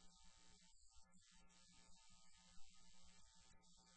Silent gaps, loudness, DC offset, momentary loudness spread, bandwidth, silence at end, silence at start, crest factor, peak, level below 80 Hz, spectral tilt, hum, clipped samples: none; -70 LUFS; under 0.1%; 0 LU; 8.2 kHz; 0 s; 0 s; 18 dB; -46 dBFS; -76 dBFS; -1.5 dB/octave; none; under 0.1%